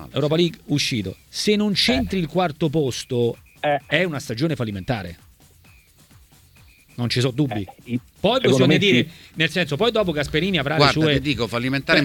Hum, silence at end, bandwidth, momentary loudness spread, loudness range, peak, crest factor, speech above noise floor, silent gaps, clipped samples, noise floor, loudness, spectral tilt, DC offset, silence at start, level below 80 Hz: none; 0 s; 19 kHz; 11 LU; 9 LU; 0 dBFS; 20 dB; 31 dB; none; under 0.1%; -52 dBFS; -21 LUFS; -5 dB/octave; under 0.1%; 0 s; -46 dBFS